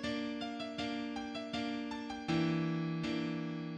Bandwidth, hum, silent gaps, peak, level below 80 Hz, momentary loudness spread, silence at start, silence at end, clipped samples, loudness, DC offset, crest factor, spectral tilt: 9.4 kHz; none; none; -22 dBFS; -66 dBFS; 7 LU; 0 s; 0 s; under 0.1%; -38 LUFS; under 0.1%; 16 dB; -6 dB/octave